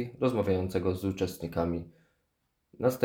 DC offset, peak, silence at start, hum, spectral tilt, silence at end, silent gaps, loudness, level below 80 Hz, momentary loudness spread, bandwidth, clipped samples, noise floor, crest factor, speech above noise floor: under 0.1%; -10 dBFS; 0 s; none; -7 dB/octave; 0 s; none; -31 LUFS; -56 dBFS; 5 LU; 19.5 kHz; under 0.1%; -78 dBFS; 22 dB; 48 dB